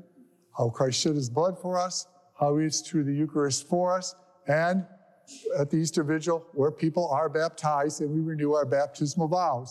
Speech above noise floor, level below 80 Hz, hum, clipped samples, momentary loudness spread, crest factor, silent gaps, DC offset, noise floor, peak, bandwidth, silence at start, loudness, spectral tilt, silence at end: 32 dB; -78 dBFS; none; under 0.1%; 6 LU; 14 dB; none; under 0.1%; -59 dBFS; -12 dBFS; 13 kHz; 0.55 s; -27 LUFS; -5 dB/octave; 0 s